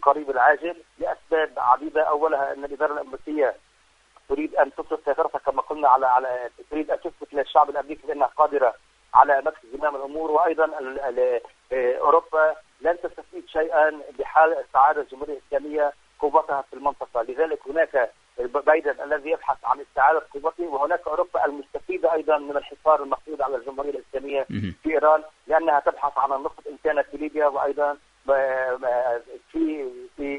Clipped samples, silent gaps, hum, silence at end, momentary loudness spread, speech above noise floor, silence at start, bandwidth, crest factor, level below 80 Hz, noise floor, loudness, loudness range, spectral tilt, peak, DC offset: under 0.1%; none; none; 0 s; 11 LU; 35 dB; 0 s; 10 kHz; 24 dB; -58 dBFS; -58 dBFS; -23 LUFS; 3 LU; -6 dB/octave; 0 dBFS; under 0.1%